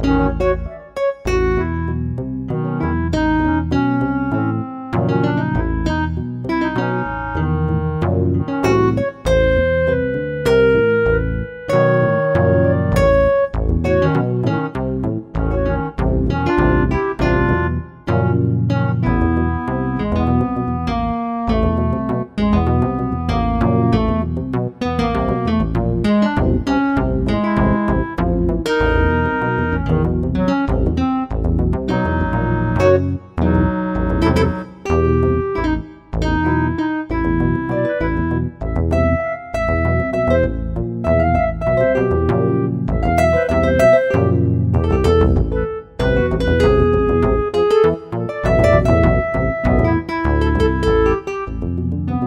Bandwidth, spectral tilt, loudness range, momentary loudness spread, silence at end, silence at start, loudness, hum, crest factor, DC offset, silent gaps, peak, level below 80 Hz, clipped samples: 11.5 kHz; -8 dB/octave; 4 LU; 7 LU; 0 s; 0 s; -17 LUFS; none; 16 dB; under 0.1%; none; -2 dBFS; -26 dBFS; under 0.1%